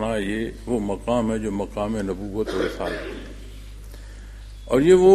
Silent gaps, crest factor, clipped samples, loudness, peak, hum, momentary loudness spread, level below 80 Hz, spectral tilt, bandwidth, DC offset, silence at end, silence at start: none; 20 dB; under 0.1%; -24 LUFS; -2 dBFS; none; 20 LU; -38 dBFS; -6.5 dB/octave; 13 kHz; under 0.1%; 0 s; 0 s